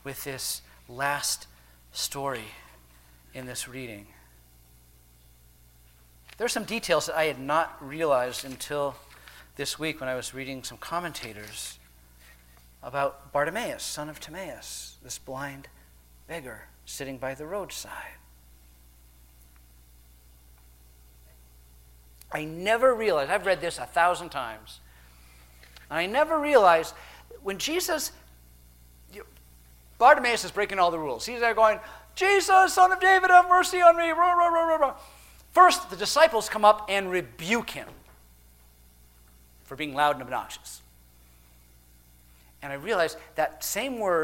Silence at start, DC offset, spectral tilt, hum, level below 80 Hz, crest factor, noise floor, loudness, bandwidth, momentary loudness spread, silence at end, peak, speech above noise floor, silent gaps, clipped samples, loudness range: 0.05 s; under 0.1%; -2.5 dB/octave; 60 Hz at -55 dBFS; -56 dBFS; 24 dB; -56 dBFS; -25 LUFS; 16.5 kHz; 21 LU; 0 s; -4 dBFS; 31 dB; none; under 0.1%; 18 LU